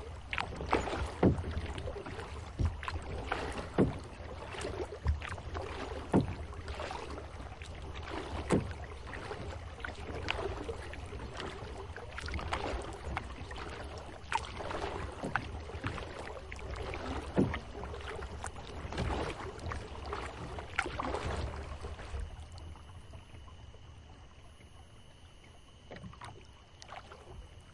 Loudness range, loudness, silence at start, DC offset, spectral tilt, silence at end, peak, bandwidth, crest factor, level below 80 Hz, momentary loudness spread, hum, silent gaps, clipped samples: 15 LU; -39 LUFS; 0 s; under 0.1%; -6 dB/octave; 0 s; -12 dBFS; 11.5 kHz; 26 dB; -46 dBFS; 19 LU; none; none; under 0.1%